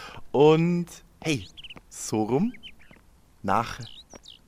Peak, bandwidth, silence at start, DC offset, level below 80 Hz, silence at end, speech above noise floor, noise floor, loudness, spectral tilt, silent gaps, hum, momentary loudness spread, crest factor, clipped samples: -8 dBFS; 15.5 kHz; 0 s; under 0.1%; -54 dBFS; 0.45 s; 31 dB; -56 dBFS; -25 LUFS; -6 dB/octave; none; none; 25 LU; 20 dB; under 0.1%